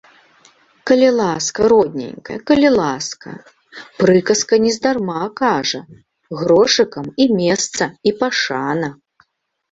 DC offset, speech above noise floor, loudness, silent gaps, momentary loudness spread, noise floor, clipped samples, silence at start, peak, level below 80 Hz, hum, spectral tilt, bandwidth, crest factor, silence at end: under 0.1%; 50 dB; -16 LUFS; none; 14 LU; -66 dBFS; under 0.1%; 0.85 s; -2 dBFS; -52 dBFS; none; -4 dB/octave; 8 kHz; 16 dB; 0.8 s